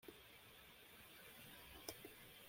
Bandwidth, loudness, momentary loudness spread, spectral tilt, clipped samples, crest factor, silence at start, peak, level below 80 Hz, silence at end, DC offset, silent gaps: 16.5 kHz; -58 LUFS; 7 LU; -2.5 dB/octave; under 0.1%; 30 dB; 0 s; -30 dBFS; -76 dBFS; 0 s; under 0.1%; none